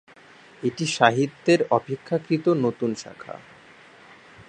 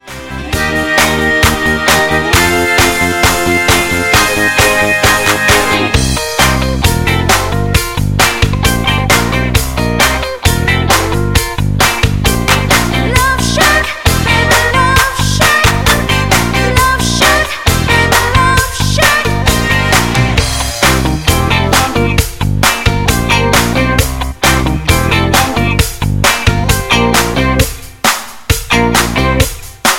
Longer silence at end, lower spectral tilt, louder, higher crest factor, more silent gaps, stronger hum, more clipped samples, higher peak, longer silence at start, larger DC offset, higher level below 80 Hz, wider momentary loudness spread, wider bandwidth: about the same, 0.05 s vs 0 s; first, -5.5 dB/octave vs -3.5 dB/octave; second, -23 LUFS vs -10 LUFS; first, 24 dB vs 10 dB; neither; neither; second, under 0.1% vs 0.1%; about the same, -2 dBFS vs 0 dBFS; first, 0.6 s vs 0.05 s; neither; second, -68 dBFS vs -20 dBFS; first, 19 LU vs 5 LU; second, 9.8 kHz vs 17.5 kHz